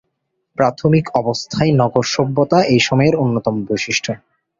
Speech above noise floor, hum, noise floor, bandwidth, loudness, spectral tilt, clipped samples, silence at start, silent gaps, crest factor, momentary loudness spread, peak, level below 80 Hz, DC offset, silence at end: 56 dB; none; -72 dBFS; 7.6 kHz; -16 LUFS; -5.5 dB/octave; under 0.1%; 0.6 s; none; 16 dB; 7 LU; 0 dBFS; -50 dBFS; under 0.1%; 0.45 s